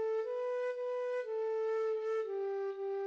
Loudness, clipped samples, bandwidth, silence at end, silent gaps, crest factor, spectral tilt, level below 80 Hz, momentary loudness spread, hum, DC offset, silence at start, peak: -37 LUFS; under 0.1%; 7.4 kHz; 0 s; none; 8 dB; -3 dB/octave; -86 dBFS; 3 LU; none; under 0.1%; 0 s; -28 dBFS